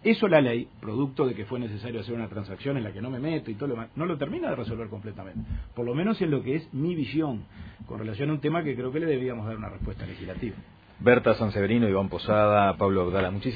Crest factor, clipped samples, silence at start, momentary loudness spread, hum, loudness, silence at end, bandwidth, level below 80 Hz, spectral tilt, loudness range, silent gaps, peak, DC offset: 22 dB; under 0.1%; 0 s; 15 LU; none; -27 LUFS; 0 s; 5 kHz; -48 dBFS; -10 dB/octave; 7 LU; none; -6 dBFS; under 0.1%